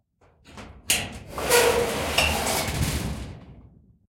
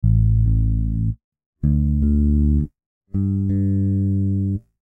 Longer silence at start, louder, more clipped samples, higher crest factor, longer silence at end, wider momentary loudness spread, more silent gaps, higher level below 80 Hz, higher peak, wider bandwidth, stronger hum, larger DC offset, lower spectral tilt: first, 0.5 s vs 0.05 s; second, -23 LUFS vs -20 LUFS; neither; first, 22 dB vs 12 dB; first, 0.45 s vs 0.25 s; first, 22 LU vs 8 LU; second, none vs 1.24-1.32 s, 1.46-1.53 s, 2.86-3.01 s; second, -40 dBFS vs -24 dBFS; first, -4 dBFS vs -8 dBFS; first, 16.5 kHz vs 1.8 kHz; neither; neither; second, -2.5 dB/octave vs -13.5 dB/octave